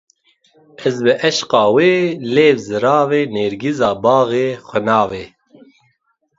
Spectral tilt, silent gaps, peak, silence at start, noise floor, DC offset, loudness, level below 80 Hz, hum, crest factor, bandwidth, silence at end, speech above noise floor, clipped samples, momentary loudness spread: -5 dB/octave; none; 0 dBFS; 0.8 s; -65 dBFS; under 0.1%; -15 LUFS; -56 dBFS; none; 16 dB; 7.8 kHz; 1.1 s; 50 dB; under 0.1%; 7 LU